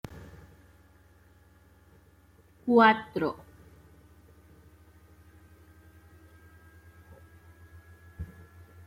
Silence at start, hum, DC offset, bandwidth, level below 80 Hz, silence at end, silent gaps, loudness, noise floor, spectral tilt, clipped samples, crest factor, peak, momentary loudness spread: 0.15 s; none; under 0.1%; 15.5 kHz; -60 dBFS; 0.6 s; none; -25 LUFS; -60 dBFS; -6.5 dB/octave; under 0.1%; 26 dB; -8 dBFS; 31 LU